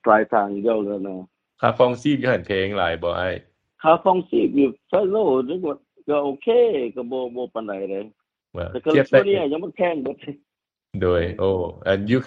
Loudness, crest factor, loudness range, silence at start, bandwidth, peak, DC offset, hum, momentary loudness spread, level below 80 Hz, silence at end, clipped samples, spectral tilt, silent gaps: -21 LUFS; 20 dB; 3 LU; 0.05 s; 7.6 kHz; -2 dBFS; under 0.1%; none; 14 LU; -52 dBFS; 0 s; under 0.1%; -7.5 dB/octave; none